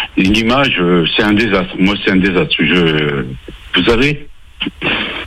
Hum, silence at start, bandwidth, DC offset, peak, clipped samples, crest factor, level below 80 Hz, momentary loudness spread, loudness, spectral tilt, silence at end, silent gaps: none; 0 s; 14 kHz; under 0.1%; 0 dBFS; under 0.1%; 12 dB; -32 dBFS; 11 LU; -13 LUFS; -6 dB/octave; 0 s; none